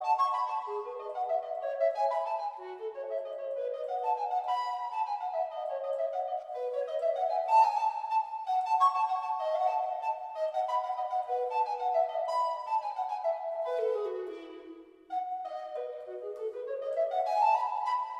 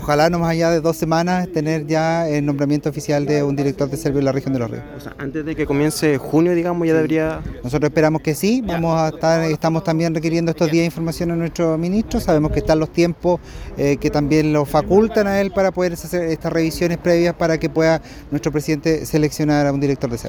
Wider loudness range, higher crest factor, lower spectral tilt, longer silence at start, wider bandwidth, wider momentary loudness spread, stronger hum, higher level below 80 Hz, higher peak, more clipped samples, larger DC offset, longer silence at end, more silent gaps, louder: first, 7 LU vs 2 LU; about the same, 18 dB vs 16 dB; second, -2 dB/octave vs -6.5 dB/octave; about the same, 0 s vs 0 s; second, 9.6 kHz vs 19 kHz; first, 12 LU vs 6 LU; neither; second, -84 dBFS vs -38 dBFS; second, -14 dBFS vs -2 dBFS; neither; neither; about the same, 0 s vs 0 s; neither; second, -32 LUFS vs -18 LUFS